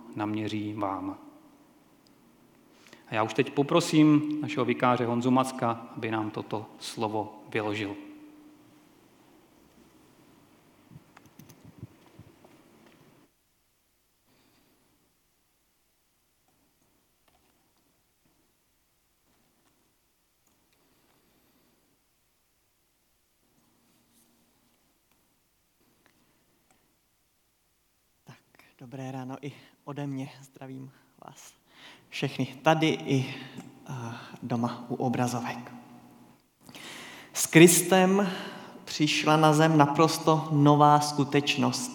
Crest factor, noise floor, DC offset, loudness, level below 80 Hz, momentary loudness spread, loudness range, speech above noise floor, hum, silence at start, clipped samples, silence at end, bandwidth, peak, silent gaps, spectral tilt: 28 dB; -71 dBFS; under 0.1%; -26 LUFS; -78 dBFS; 24 LU; 18 LU; 46 dB; none; 0.05 s; under 0.1%; 0 s; 19 kHz; -2 dBFS; none; -5 dB/octave